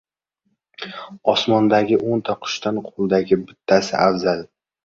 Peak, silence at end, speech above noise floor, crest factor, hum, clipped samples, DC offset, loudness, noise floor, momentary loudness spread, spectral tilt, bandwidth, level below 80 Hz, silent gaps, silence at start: -2 dBFS; 0.4 s; 53 dB; 18 dB; none; under 0.1%; under 0.1%; -19 LUFS; -72 dBFS; 12 LU; -5.5 dB/octave; 7.8 kHz; -58 dBFS; none; 0.8 s